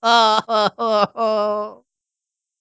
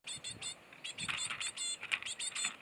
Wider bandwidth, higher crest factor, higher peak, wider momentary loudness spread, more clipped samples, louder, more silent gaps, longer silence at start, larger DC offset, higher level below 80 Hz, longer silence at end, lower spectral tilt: second, 8 kHz vs over 20 kHz; second, 18 dB vs 26 dB; first, 0 dBFS vs -14 dBFS; about the same, 10 LU vs 8 LU; neither; first, -18 LUFS vs -38 LUFS; neither; about the same, 0.05 s vs 0.05 s; neither; about the same, -70 dBFS vs -74 dBFS; first, 0.85 s vs 0 s; first, -3.5 dB/octave vs 1 dB/octave